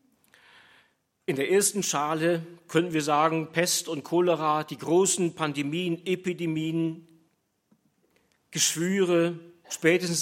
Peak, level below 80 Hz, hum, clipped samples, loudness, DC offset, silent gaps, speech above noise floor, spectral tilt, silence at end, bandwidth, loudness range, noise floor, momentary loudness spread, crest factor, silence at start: -6 dBFS; -76 dBFS; none; under 0.1%; -26 LUFS; under 0.1%; none; 45 dB; -4 dB/octave; 0 s; 16.5 kHz; 5 LU; -71 dBFS; 8 LU; 20 dB; 1.3 s